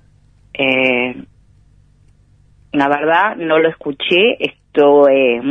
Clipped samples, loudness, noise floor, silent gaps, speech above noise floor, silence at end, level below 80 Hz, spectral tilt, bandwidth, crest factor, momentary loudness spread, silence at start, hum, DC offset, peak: under 0.1%; -14 LUFS; -50 dBFS; none; 37 dB; 0 s; -54 dBFS; -6.5 dB/octave; 6.4 kHz; 16 dB; 12 LU; 0.6 s; none; under 0.1%; 0 dBFS